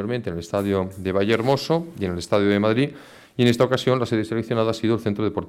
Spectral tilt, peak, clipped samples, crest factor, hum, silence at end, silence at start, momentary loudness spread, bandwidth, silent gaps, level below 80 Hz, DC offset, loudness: -6.5 dB/octave; -6 dBFS; under 0.1%; 16 dB; none; 0 s; 0 s; 8 LU; 16 kHz; none; -54 dBFS; under 0.1%; -22 LUFS